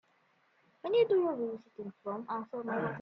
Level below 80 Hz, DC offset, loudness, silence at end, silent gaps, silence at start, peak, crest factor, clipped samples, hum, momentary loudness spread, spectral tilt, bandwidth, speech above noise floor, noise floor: -80 dBFS; under 0.1%; -34 LUFS; 0 s; none; 0.85 s; -18 dBFS; 16 dB; under 0.1%; none; 16 LU; -8.5 dB/octave; 5.6 kHz; 38 dB; -71 dBFS